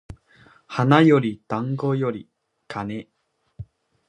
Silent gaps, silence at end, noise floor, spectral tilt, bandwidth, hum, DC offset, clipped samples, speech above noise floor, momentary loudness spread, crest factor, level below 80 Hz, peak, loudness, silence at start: none; 0.45 s; -54 dBFS; -8 dB/octave; 9.8 kHz; none; under 0.1%; under 0.1%; 34 dB; 27 LU; 22 dB; -56 dBFS; -2 dBFS; -21 LUFS; 0.1 s